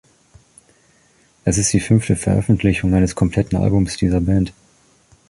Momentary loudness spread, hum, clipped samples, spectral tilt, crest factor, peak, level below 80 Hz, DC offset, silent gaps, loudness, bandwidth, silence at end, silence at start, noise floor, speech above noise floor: 4 LU; none; under 0.1%; -6 dB/octave; 16 dB; -2 dBFS; -32 dBFS; under 0.1%; none; -18 LUFS; 11.5 kHz; 0.8 s; 1.45 s; -56 dBFS; 40 dB